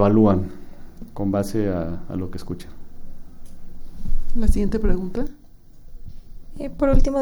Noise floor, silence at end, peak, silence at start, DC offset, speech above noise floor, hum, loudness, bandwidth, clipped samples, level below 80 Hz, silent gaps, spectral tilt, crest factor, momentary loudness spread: -41 dBFS; 0 s; -4 dBFS; 0 s; under 0.1%; 23 dB; none; -24 LUFS; 11.5 kHz; under 0.1%; -24 dBFS; none; -8.5 dB/octave; 16 dB; 25 LU